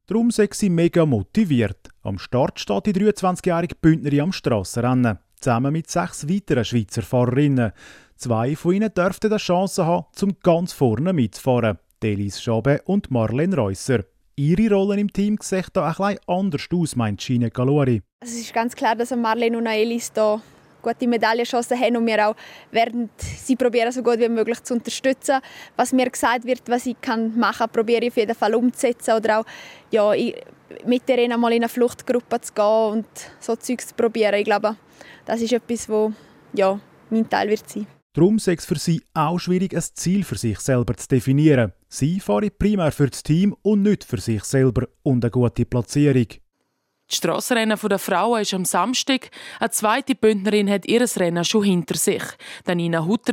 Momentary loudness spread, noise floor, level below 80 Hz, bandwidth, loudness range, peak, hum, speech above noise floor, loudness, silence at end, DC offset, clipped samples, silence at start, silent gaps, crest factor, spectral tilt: 7 LU; -72 dBFS; -48 dBFS; 16.5 kHz; 2 LU; -4 dBFS; none; 52 dB; -21 LUFS; 0 s; under 0.1%; under 0.1%; 0.1 s; 18.13-18.19 s, 38.02-38.10 s; 18 dB; -5.5 dB/octave